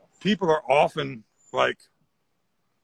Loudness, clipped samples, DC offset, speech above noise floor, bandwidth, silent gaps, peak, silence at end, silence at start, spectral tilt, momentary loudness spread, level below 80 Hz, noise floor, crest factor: -24 LUFS; under 0.1%; under 0.1%; 52 dB; 11.5 kHz; none; -6 dBFS; 1.1 s; 0.2 s; -5.5 dB/octave; 15 LU; -62 dBFS; -76 dBFS; 20 dB